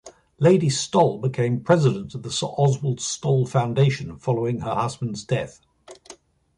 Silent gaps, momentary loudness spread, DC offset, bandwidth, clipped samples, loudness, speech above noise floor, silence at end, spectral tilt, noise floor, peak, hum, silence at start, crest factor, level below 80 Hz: none; 8 LU; under 0.1%; 11 kHz; under 0.1%; -22 LUFS; 27 dB; 0.45 s; -6 dB/octave; -49 dBFS; -4 dBFS; none; 0.05 s; 18 dB; -54 dBFS